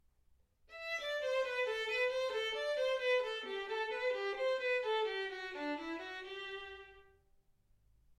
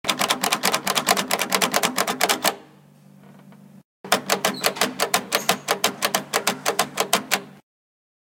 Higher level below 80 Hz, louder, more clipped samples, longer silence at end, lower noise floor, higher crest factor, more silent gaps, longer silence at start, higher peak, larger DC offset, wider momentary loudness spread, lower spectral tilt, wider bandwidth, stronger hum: about the same, -72 dBFS vs -68 dBFS; second, -37 LUFS vs -21 LUFS; neither; first, 1.1 s vs 0.65 s; first, -71 dBFS vs -50 dBFS; second, 16 dB vs 24 dB; second, none vs 3.85-4.04 s; first, 0.7 s vs 0.05 s; second, -24 dBFS vs 0 dBFS; neither; first, 10 LU vs 4 LU; about the same, -1.5 dB/octave vs -1 dB/octave; second, 13 kHz vs 17 kHz; neither